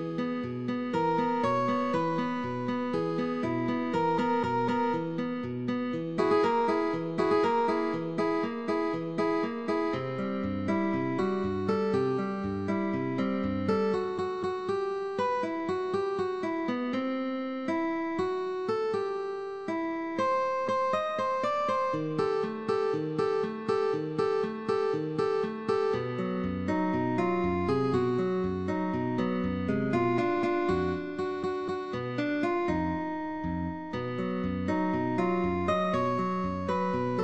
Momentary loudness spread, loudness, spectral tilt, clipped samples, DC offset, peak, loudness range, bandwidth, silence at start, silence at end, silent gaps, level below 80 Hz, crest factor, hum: 5 LU; -30 LUFS; -7.5 dB/octave; under 0.1%; 0.2%; -14 dBFS; 3 LU; 9 kHz; 0 s; 0 s; none; -60 dBFS; 16 dB; none